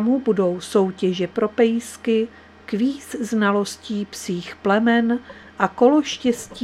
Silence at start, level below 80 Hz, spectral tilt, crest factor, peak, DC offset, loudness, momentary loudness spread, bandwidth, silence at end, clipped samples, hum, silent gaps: 0 s; -58 dBFS; -5.5 dB/octave; 20 dB; -2 dBFS; under 0.1%; -21 LUFS; 11 LU; 14 kHz; 0 s; under 0.1%; none; none